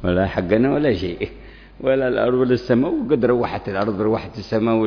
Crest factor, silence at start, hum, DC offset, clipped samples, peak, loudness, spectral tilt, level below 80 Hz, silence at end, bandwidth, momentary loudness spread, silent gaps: 16 dB; 0 s; none; under 0.1%; under 0.1%; -4 dBFS; -20 LUFS; -8.5 dB/octave; -42 dBFS; 0 s; 5.4 kHz; 7 LU; none